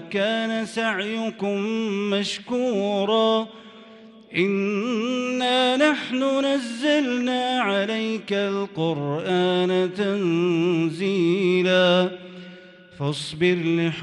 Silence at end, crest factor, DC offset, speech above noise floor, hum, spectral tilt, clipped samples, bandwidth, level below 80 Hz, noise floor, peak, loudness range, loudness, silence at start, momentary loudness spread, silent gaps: 0 s; 16 dB; under 0.1%; 24 dB; none; -5.5 dB/octave; under 0.1%; 11.5 kHz; -68 dBFS; -46 dBFS; -8 dBFS; 3 LU; -22 LUFS; 0 s; 7 LU; none